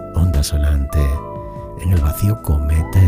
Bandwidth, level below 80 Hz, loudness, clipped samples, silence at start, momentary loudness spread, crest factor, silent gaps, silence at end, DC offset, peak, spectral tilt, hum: 16 kHz; -20 dBFS; -18 LUFS; under 0.1%; 0 s; 10 LU; 14 dB; none; 0 s; under 0.1%; -2 dBFS; -6.5 dB/octave; none